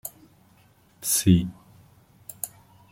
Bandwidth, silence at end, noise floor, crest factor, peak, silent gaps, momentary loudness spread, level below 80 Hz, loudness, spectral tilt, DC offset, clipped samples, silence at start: 16.5 kHz; 0.45 s; -58 dBFS; 24 dB; -4 dBFS; none; 23 LU; -52 dBFS; -24 LUFS; -4.5 dB/octave; under 0.1%; under 0.1%; 0.05 s